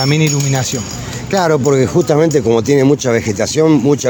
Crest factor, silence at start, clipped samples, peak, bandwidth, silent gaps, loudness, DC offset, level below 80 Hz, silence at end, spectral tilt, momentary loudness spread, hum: 12 dB; 0 s; under 0.1%; 0 dBFS; over 20 kHz; none; -13 LUFS; under 0.1%; -42 dBFS; 0 s; -5.5 dB/octave; 7 LU; none